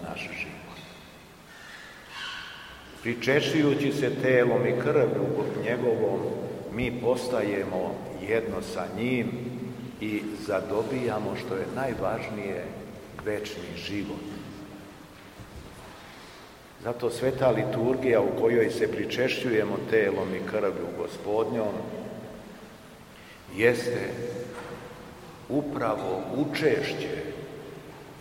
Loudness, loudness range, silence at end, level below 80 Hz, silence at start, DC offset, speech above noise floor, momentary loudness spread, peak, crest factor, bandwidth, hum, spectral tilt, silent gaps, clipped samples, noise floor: -28 LUFS; 10 LU; 0 s; -56 dBFS; 0 s; under 0.1%; 22 dB; 21 LU; -8 dBFS; 22 dB; 16 kHz; none; -6 dB/octave; none; under 0.1%; -49 dBFS